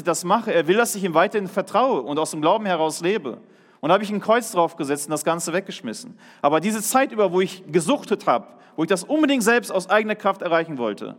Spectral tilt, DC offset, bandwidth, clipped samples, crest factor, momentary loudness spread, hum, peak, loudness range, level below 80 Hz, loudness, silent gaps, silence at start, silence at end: -4 dB/octave; under 0.1%; 17.5 kHz; under 0.1%; 18 dB; 8 LU; none; -4 dBFS; 2 LU; -78 dBFS; -21 LUFS; none; 0 s; 0.05 s